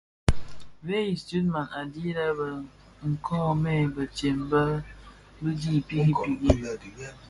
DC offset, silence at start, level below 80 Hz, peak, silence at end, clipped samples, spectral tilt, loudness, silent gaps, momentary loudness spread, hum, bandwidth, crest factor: under 0.1%; 0.25 s; -40 dBFS; -4 dBFS; 0 s; under 0.1%; -7 dB/octave; -28 LUFS; none; 12 LU; 50 Hz at -45 dBFS; 11.5 kHz; 24 dB